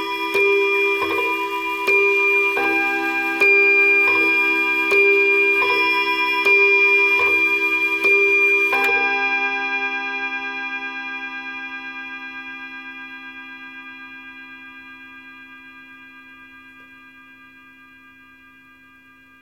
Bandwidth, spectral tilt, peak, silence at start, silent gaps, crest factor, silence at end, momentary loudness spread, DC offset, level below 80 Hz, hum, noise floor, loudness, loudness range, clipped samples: 16.5 kHz; -2.5 dB/octave; -6 dBFS; 0 s; none; 14 dB; 2.6 s; 22 LU; under 0.1%; -64 dBFS; none; -49 dBFS; -16 LUFS; 20 LU; under 0.1%